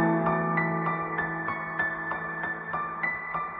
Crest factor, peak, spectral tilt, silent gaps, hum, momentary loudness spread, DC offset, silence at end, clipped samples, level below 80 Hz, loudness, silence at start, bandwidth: 16 dB; -12 dBFS; -6 dB/octave; none; none; 6 LU; under 0.1%; 0 s; under 0.1%; -60 dBFS; -29 LUFS; 0 s; 4.7 kHz